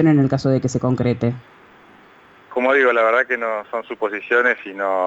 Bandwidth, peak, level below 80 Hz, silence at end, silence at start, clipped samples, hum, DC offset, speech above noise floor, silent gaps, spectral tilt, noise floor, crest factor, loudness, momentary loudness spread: 8 kHz; -6 dBFS; -54 dBFS; 0 s; 0 s; under 0.1%; none; under 0.1%; 30 dB; none; -7 dB/octave; -48 dBFS; 14 dB; -19 LUFS; 10 LU